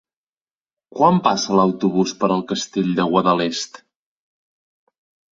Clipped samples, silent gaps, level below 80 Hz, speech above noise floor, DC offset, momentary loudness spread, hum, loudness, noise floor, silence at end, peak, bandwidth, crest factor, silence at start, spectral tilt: under 0.1%; none; -60 dBFS; over 72 dB; under 0.1%; 8 LU; none; -18 LUFS; under -90 dBFS; 1.55 s; -2 dBFS; 7.8 kHz; 20 dB; 0.95 s; -5.5 dB/octave